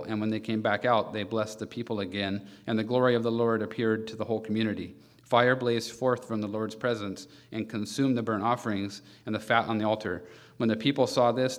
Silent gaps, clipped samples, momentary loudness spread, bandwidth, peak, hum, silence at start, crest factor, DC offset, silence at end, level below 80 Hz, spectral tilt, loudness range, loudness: none; under 0.1%; 11 LU; 15 kHz; -6 dBFS; none; 0 s; 22 dB; under 0.1%; 0 s; -70 dBFS; -5.5 dB/octave; 2 LU; -29 LUFS